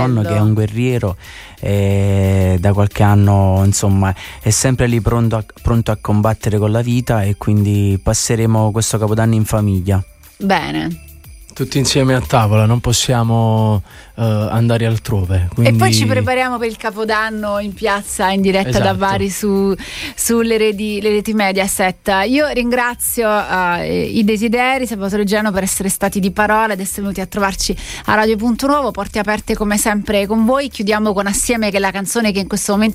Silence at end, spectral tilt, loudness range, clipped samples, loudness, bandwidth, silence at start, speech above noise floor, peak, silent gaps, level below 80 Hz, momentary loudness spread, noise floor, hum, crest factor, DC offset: 0 s; -5 dB/octave; 2 LU; under 0.1%; -15 LUFS; 16 kHz; 0 s; 22 dB; 0 dBFS; none; -34 dBFS; 6 LU; -37 dBFS; none; 14 dB; under 0.1%